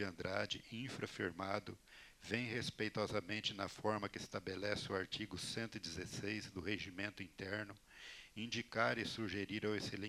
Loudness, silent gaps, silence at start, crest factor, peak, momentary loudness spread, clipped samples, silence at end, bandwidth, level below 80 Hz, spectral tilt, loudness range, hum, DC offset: -43 LUFS; none; 0 s; 24 dB; -20 dBFS; 9 LU; under 0.1%; 0 s; 15 kHz; -70 dBFS; -4.5 dB/octave; 3 LU; none; under 0.1%